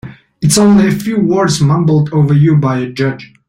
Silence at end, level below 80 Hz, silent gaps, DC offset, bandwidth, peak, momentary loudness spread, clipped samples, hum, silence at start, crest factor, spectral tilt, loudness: 0.25 s; -44 dBFS; none; under 0.1%; 15 kHz; 0 dBFS; 9 LU; under 0.1%; none; 0.05 s; 12 dB; -6 dB/octave; -11 LUFS